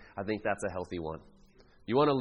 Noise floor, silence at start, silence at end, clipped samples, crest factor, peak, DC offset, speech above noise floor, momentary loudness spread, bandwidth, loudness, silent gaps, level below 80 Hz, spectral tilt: -59 dBFS; 0 s; 0 s; under 0.1%; 18 dB; -14 dBFS; under 0.1%; 28 dB; 16 LU; 10 kHz; -33 LUFS; none; -60 dBFS; -6 dB/octave